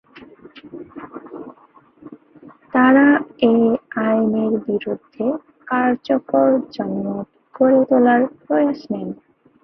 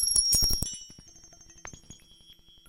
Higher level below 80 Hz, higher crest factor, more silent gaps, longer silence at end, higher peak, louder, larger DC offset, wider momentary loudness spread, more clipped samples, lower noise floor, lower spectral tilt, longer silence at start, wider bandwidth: second, -62 dBFS vs -42 dBFS; about the same, 18 dB vs 22 dB; neither; second, 0.5 s vs 0.75 s; first, -2 dBFS vs -8 dBFS; first, -18 LUFS vs -24 LUFS; neither; second, 22 LU vs 25 LU; neither; second, -51 dBFS vs -56 dBFS; first, -9 dB/octave vs -0.5 dB/octave; first, 0.15 s vs 0 s; second, 5.8 kHz vs 17 kHz